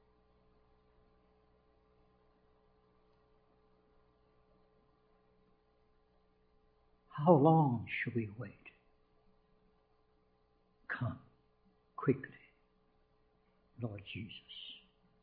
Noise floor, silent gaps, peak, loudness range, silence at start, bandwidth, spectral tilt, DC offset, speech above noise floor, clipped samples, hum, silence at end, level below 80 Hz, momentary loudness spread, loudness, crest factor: -73 dBFS; none; -14 dBFS; 15 LU; 7.15 s; 4.6 kHz; -6.5 dB/octave; under 0.1%; 40 dB; under 0.1%; none; 0.45 s; -74 dBFS; 23 LU; -34 LUFS; 28 dB